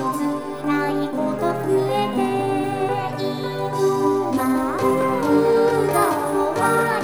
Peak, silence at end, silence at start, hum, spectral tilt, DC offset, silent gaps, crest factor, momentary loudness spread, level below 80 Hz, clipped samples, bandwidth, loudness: -6 dBFS; 0 s; 0 s; none; -6 dB/octave; 0.4%; none; 14 dB; 7 LU; -54 dBFS; under 0.1%; over 20 kHz; -21 LUFS